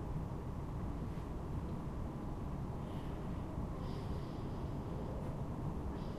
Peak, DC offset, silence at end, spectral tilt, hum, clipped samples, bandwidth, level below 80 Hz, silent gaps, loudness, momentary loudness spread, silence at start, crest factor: -30 dBFS; under 0.1%; 0 s; -8.5 dB/octave; none; under 0.1%; 15 kHz; -46 dBFS; none; -44 LUFS; 1 LU; 0 s; 12 dB